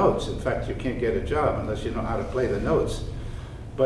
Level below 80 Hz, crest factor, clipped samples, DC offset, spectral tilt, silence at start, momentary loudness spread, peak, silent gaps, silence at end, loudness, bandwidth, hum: -36 dBFS; 18 dB; under 0.1%; under 0.1%; -7 dB/octave; 0 s; 12 LU; -8 dBFS; none; 0 s; -27 LUFS; 12 kHz; none